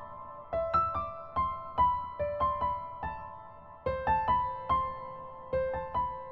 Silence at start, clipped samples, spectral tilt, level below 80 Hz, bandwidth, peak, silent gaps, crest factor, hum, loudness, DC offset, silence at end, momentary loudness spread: 0 s; under 0.1%; -8.5 dB/octave; -48 dBFS; 5.8 kHz; -16 dBFS; none; 16 dB; none; -32 LUFS; 0.1%; 0 s; 15 LU